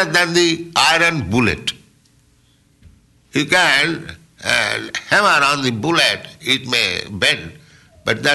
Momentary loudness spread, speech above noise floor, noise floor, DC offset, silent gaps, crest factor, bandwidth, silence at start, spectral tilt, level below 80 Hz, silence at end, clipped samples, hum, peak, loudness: 11 LU; 39 dB; -55 dBFS; under 0.1%; none; 14 dB; 12.5 kHz; 0 s; -3 dB/octave; -48 dBFS; 0 s; under 0.1%; none; -4 dBFS; -16 LUFS